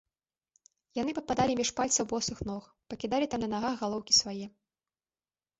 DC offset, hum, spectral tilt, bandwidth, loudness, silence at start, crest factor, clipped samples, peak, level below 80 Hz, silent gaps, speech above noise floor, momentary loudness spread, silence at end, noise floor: under 0.1%; none; -2.5 dB/octave; 8.2 kHz; -30 LUFS; 0.95 s; 22 dB; under 0.1%; -12 dBFS; -58 dBFS; none; over 59 dB; 16 LU; 1.1 s; under -90 dBFS